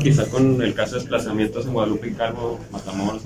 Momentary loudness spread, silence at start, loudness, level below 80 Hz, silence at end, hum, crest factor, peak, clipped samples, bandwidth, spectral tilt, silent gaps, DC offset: 10 LU; 0 s; -22 LUFS; -44 dBFS; 0 s; none; 16 dB; -6 dBFS; under 0.1%; 15.5 kHz; -6.5 dB/octave; none; under 0.1%